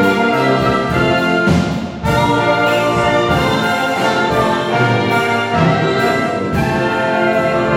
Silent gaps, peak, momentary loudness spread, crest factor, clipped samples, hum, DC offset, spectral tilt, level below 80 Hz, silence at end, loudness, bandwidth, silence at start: none; -2 dBFS; 3 LU; 12 dB; under 0.1%; none; under 0.1%; -6 dB/octave; -38 dBFS; 0 s; -14 LUFS; 17.5 kHz; 0 s